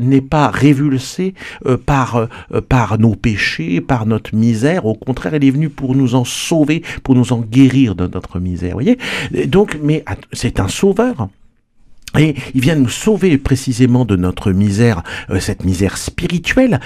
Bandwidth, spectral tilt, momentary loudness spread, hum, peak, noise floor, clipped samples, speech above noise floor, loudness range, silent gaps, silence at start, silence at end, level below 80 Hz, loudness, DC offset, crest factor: 14.5 kHz; -6.5 dB/octave; 9 LU; none; 0 dBFS; -47 dBFS; under 0.1%; 33 dB; 3 LU; none; 0 s; 0 s; -34 dBFS; -15 LUFS; under 0.1%; 14 dB